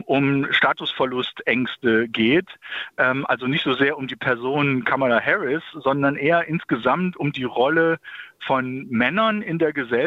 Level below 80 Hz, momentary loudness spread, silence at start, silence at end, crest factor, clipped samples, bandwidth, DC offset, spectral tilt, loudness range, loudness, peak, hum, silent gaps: -62 dBFS; 6 LU; 0 s; 0 s; 16 dB; under 0.1%; 7.2 kHz; under 0.1%; -7.5 dB/octave; 1 LU; -21 LUFS; -4 dBFS; none; none